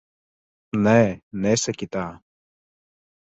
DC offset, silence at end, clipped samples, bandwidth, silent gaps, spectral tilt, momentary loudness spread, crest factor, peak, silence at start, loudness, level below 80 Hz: under 0.1%; 1.15 s; under 0.1%; 8.2 kHz; 1.23-1.31 s; -5 dB/octave; 12 LU; 20 dB; -4 dBFS; 0.75 s; -22 LUFS; -54 dBFS